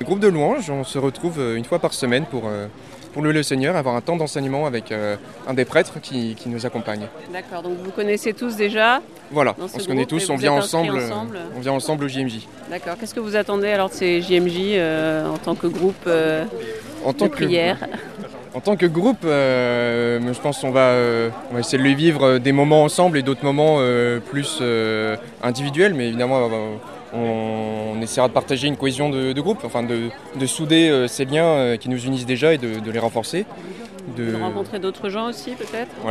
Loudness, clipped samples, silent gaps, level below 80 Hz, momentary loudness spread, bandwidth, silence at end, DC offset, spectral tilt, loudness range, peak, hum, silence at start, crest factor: -20 LUFS; under 0.1%; none; -58 dBFS; 12 LU; 14.5 kHz; 0 s; 0.2%; -5 dB/octave; 6 LU; -2 dBFS; none; 0 s; 18 dB